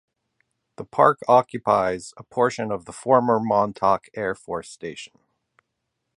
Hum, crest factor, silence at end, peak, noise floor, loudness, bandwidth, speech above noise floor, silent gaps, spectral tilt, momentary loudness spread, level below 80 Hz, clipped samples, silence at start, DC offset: none; 22 dB; 1.1 s; -2 dBFS; -79 dBFS; -22 LUFS; 11.5 kHz; 57 dB; none; -6 dB/octave; 16 LU; -60 dBFS; under 0.1%; 0.8 s; under 0.1%